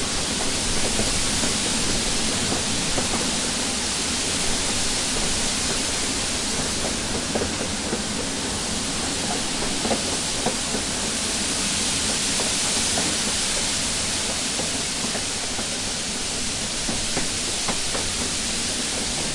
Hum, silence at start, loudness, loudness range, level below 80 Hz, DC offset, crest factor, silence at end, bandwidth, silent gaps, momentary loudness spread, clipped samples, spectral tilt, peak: none; 0 s; -22 LUFS; 3 LU; -38 dBFS; under 0.1%; 16 dB; 0 s; 11.5 kHz; none; 4 LU; under 0.1%; -1.5 dB/octave; -8 dBFS